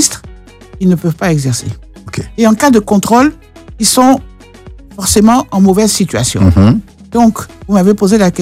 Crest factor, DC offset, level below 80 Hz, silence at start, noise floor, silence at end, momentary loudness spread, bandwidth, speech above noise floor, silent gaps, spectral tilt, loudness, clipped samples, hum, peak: 10 dB; under 0.1%; -32 dBFS; 0 s; -33 dBFS; 0 s; 11 LU; 16 kHz; 24 dB; none; -5 dB/octave; -10 LUFS; 0.4%; none; 0 dBFS